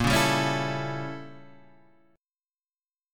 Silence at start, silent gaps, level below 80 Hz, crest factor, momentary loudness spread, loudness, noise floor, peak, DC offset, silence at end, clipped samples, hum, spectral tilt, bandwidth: 0 s; 2.85-2.89 s; -48 dBFS; 22 dB; 19 LU; -27 LUFS; under -90 dBFS; -8 dBFS; under 0.1%; 0 s; under 0.1%; none; -4.5 dB/octave; 17.5 kHz